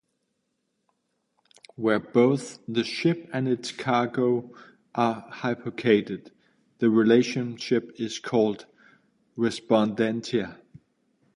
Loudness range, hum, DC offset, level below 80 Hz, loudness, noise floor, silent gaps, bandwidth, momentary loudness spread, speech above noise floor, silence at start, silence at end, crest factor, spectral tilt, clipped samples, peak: 3 LU; none; under 0.1%; -68 dBFS; -25 LUFS; -77 dBFS; none; 11 kHz; 10 LU; 52 dB; 1.8 s; 0.8 s; 20 dB; -6 dB/octave; under 0.1%; -6 dBFS